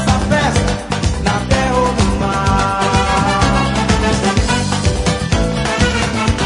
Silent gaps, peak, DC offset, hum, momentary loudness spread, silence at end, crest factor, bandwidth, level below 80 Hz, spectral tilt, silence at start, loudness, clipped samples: none; 0 dBFS; under 0.1%; none; 3 LU; 0 s; 14 dB; 11 kHz; -22 dBFS; -5 dB/octave; 0 s; -15 LUFS; under 0.1%